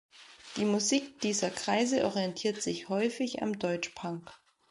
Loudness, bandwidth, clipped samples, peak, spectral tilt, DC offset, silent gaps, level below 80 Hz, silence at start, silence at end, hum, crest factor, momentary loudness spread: -31 LUFS; 11.5 kHz; under 0.1%; -14 dBFS; -3.5 dB/octave; under 0.1%; none; -70 dBFS; 0.15 s; 0.35 s; none; 18 dB; 11 LU